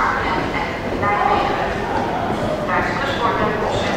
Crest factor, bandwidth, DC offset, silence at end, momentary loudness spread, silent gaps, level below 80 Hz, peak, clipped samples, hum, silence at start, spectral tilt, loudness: 14 dB; 16.5 kHz; under 0.1%; 0 s; 4 LU; none; -36 dBFS; -4 dBFS; under 0.1%; none; 0 s; -5.5 dB/octave; -20 LUFS